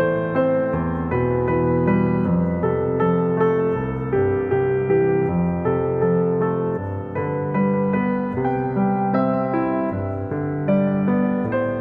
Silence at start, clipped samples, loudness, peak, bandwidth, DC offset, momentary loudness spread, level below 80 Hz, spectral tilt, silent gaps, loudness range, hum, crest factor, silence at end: 0 s; under 0.1%; -21 LUFS; -8 dBFS; 4.3 kHz; under 0.1%; 5 LU; -44 dBFS; -11.5 dB/octave; none; 2 LU; none; 12 dB; 0 s